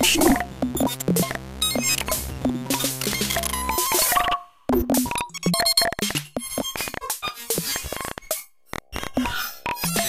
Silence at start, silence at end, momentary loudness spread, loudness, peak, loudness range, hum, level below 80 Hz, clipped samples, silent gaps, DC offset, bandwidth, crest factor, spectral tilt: 0 s; 0 s; 11 LU; -23 LUFS; -4 dBFS; 6 LU; none; -42 dBFS; under 0.1%; none; under 0.1%; 16 kHz; 20 dB; -2.5 dB/octave